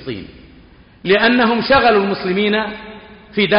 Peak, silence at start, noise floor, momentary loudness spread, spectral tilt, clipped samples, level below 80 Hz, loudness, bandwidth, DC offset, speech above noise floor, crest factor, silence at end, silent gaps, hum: -4 dBFS; 0 s; -44 dBFS; 18 LU; -2.5 dB/octave; under 0.1%; -44 dBFS; -15 LUFS; 5.4 kHz; under 0.1%; 29 dB; 14 dB; 0 s; none; none